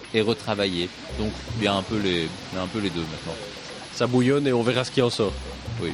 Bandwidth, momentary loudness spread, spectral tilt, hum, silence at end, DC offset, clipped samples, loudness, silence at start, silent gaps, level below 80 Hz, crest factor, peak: 13.5 kHz; 13 LU; -5.5 dB/octave; none; 0 s; under 0.1%; under 0.1%; -25 LUFS; 0 s; none; -44 dBFS; 20 dB; -6 dBFS